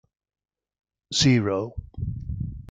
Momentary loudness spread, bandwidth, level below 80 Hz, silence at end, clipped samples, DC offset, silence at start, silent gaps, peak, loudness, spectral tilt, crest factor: 14 LU; 9.4 kHz; -42 dBFS; 0.05 s; under 0.1%; under 0.1%; 1.1 s; none; -8 dBFS; -25 LUFS; -5 dB/octave; 20 dB